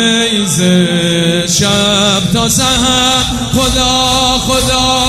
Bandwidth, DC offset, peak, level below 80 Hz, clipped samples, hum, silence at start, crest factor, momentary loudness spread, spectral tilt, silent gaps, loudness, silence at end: 16 kHz; under 0.1%; 0 dBFS; -28 dBFS; under 0.1%; none; 0 s; 10 dB; 2 LU; -3 dB/octave; none; -10 LUFS; 0 s